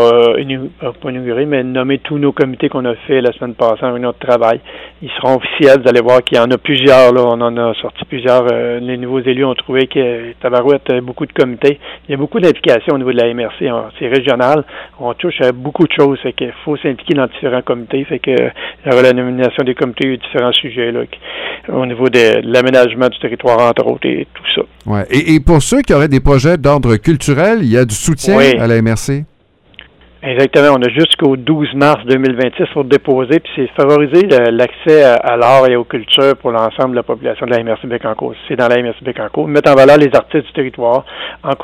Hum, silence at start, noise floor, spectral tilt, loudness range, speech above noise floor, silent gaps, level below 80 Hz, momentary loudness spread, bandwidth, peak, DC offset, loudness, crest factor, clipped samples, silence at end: none; 0 s; -41 dBFS; -5.5 dB/octave; 5 LU; 30 dB; none; -34 dBFS; 11 LU; 15.5 kHz; 0 dBFS; under 0.1%; -12 LUFS; 12 dB; 0.4%; 0 s